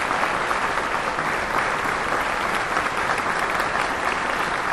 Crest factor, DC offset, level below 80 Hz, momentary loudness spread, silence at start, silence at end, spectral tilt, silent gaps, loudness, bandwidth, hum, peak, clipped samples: 18 dB; under 0.1%; -46 dBFS; 1 LU; 0 s; 0 s; -3 dB/octave; none; -22 LUFS; 13.5 kHz; none; -6 dBFS; under 0.1%